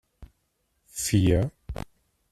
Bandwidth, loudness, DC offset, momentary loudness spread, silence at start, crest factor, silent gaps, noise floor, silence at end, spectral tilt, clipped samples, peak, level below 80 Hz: 14.5 kHz; -25 LUFS; under 0.1%; 18 LU; 0.2 s; 20 dB; none; -74 dBFS; 0.6 s; -5.5 dB/octave; under 0.1%; -10 dBFS; -42 dBFS